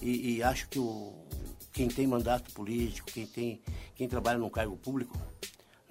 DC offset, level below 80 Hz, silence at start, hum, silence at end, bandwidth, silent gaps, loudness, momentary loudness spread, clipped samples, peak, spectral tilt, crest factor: under 0.1%; -46 dBFS; 0 s; none; 0.4 s; 16 kHz; none; -35 LUFS; 14 LU; under 0.1%; -14 dBFS; -5.5 dB/octave; 20 dB